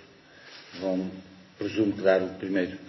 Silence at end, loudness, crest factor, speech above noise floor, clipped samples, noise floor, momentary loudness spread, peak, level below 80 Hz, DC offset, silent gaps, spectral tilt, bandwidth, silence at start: 0 s; -28 LUFS; 22 dB; 25 dB; under 0.1%; -52 dBFS; 22 LU; -8 dBFS; -62 dBFS; under 0.1%; none; -7 dB/octave; 6 kHz; 0 s